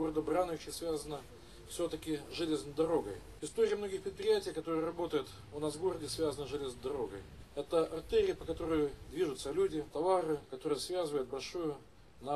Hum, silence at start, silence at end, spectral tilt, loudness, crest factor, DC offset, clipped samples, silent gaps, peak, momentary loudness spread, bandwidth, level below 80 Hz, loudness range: none; 0 s; 0 s; -5 dB/octave; -36 LUFS; 18 dB; under 0.1%; under 0.1%; none; -20 dBFS; 12 LU; 14 kHz; -58 dBFS; 3 LU